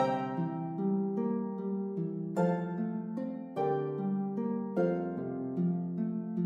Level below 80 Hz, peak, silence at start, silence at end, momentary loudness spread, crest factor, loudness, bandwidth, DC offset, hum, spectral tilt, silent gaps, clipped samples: -80 dBFS; -18 dBFS; 0 s; 0 s; 5 LU; 16 dB; -34 LUFS; 7.6 kHz; under 0.1%; none; -9.5 dB/octave; none; under 0.1%